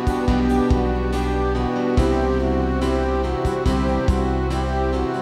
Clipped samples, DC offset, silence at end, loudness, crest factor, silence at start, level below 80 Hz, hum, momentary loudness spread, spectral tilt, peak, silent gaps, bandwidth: under 0.1%; under 0.1%; 0 s; -21 LUFS; 14 dB; 0 s; -24 dBFS; none; 3 LU; -7.5 dB/octave; -4 dBFS; none; 11.5 kHz